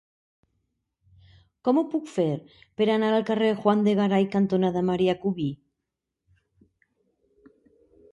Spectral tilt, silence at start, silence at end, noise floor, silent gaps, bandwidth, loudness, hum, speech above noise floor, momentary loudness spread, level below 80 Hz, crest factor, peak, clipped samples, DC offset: -7.5 dB/octave; 1.65 s; 2.55 s; -84 dBFS; none; 9 kHz; -24 LUFS; none; 60 dB; 9 LU; -66 dBFS; 18 dB; -8 dBFS; under 0.1%; under 0.1%